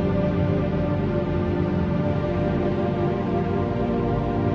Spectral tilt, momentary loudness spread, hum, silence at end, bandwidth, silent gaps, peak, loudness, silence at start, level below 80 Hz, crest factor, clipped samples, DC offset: -10 dB/octave; 1 LU; none; 0 s; 6.4 kHz; none; -10 dBFS; -24 LUFS; 0 s; -38 dBFS; 12 dB; under 0.1%; under 0.1%